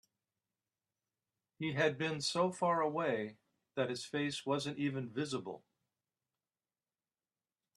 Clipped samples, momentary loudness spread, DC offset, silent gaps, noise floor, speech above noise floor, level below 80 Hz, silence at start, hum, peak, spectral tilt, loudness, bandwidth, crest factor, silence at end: under 0.1%; 9 LU; under 0.1%; none; under -90 dBFS; over 54 dB; -80 dBFS; 1.6 s; none; -18 dBFS; -5 dB/octave; -37 LUFS; 12.5 kHz; 22 dB; 2.2 s